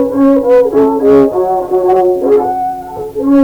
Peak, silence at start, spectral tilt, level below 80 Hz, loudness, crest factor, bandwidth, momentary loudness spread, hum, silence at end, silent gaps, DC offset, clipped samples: 0 dBFS; 0 s; -8 dB/octave; -42 dBFS; -10 LUFS; 10 dB; 20 kHz; 9 LU; none; 0 s; none; under 0.1%; under 0.1%